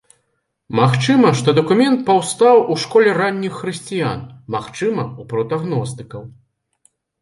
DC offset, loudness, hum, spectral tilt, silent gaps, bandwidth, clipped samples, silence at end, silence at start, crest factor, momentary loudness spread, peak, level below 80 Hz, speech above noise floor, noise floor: under 0.1%; -16 LUFS; none; -6 dB/octave; none; 11.5 kHz; under 0.1%; 0.9 s; 0.7 s; 18 dB; 13 LU; 0 dBFS; -56 dBFS; 53 dB; -70 dBFS